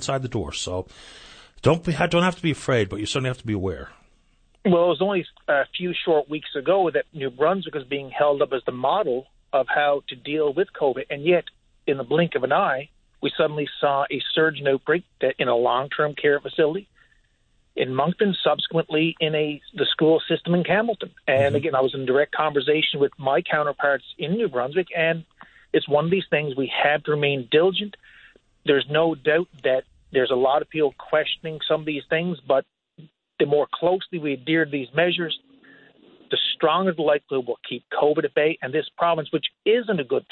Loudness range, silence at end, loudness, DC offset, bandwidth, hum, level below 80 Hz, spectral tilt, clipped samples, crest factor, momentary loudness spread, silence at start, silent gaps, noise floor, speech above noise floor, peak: 2 LU; 0.1 s; -23 LUFS; under 0.1%; 9.4 kHz; none; -56 dBFS; -5.5 dB/octave; under 0.1%; 18 dB; 7 LU; 0 s; none; -64 dBFS; 41 dB; -6 dBFS